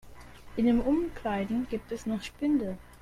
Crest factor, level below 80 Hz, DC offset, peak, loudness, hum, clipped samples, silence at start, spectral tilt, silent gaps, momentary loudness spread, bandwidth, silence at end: 16 dB; -48 dBFS; under 0.1%; -14 dBFS; -30 LUFS; none; under 0.1%; 0.05 s; -6.5 dB/octave; none; 9 LU; 14 kHz; 0.05 s